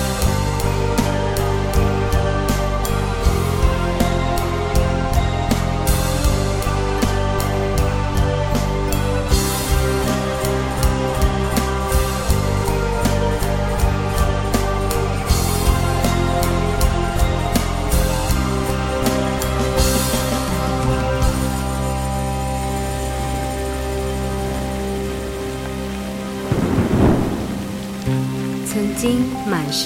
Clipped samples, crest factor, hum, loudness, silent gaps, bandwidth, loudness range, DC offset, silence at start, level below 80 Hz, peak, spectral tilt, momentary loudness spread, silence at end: under 0.1%; 16 dB; none; -20 LUFS; none; 17 kHz; 3 LU; under 0.1%; 0 s; -24 dBFS; -2 dBFS; -5.5 dB/octave; 5 LU; 0 s